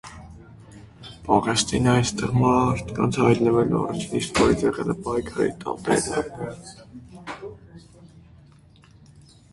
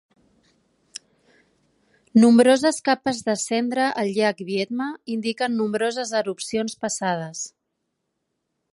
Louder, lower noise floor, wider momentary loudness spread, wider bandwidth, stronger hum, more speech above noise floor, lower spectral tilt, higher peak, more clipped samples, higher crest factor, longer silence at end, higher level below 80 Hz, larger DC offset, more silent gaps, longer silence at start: about the same, -22 LUFS vs -22 LUFS; second, -52 dBFS vs -77 dBFS; first, 21 LU vs 17 LU; about the same, 11.5 kHz vs 11.5 kHz; neither; second, 29 dB vs 56 dB; first, -5.5 dB/octave vs -4 dB/octave; about the same, -4 dBFS vs -4 dBFS; neither; about the same, 20 dB vs 18 dB; first, 1.45 s vs 1.25 s; first, -46 dBFS vs -68 dBFS; neither; neither; second, 0.05 s vs 2.15 s